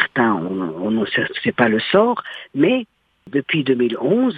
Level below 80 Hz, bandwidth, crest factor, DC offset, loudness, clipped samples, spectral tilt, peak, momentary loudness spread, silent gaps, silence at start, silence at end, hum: -60 dBFS; 4.9 kHz; 18 dB; under 0.1%; -19 LUFS; under 0.1%; -8 dB/octave; 0 dBFS; 9 LU; none; 0 s; 0 s; none